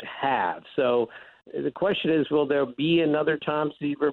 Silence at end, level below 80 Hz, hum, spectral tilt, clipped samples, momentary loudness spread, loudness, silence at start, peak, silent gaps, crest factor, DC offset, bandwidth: 0 s; -64 dBFS; none; -8.5 dB/octave; under 0.1%; 7 LU; -25 LUFS; 0 s; -14 dBFS; none; 12 dB; under 0.1%; 4.3 kHz